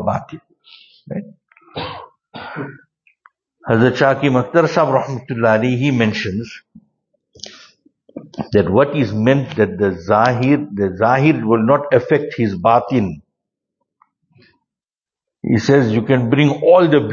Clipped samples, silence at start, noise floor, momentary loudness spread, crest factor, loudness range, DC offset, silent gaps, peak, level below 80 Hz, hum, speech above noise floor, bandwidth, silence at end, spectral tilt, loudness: under 0.1%; 0 s; under -90 dBFS; 19 LU; 16 dB; 6 LU; under 0.1%; none; 0 dBFS; -54 dBFS; none; over 75 dB; 7.4 kHz; 0 s; -7.5 dB/octave; -15 LUFS